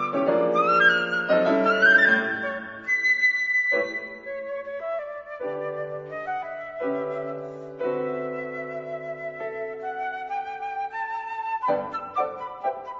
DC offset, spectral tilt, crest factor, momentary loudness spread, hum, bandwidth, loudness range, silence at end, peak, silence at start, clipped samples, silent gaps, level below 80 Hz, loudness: under 0.1%; -5 dB/octave; 18 dB; 15 LU; none; 7.6 kHz; 12 LU; 0 s; -8 dBFS; 0 s; under 0.1%; none; -68 dBFS; -24 LUFS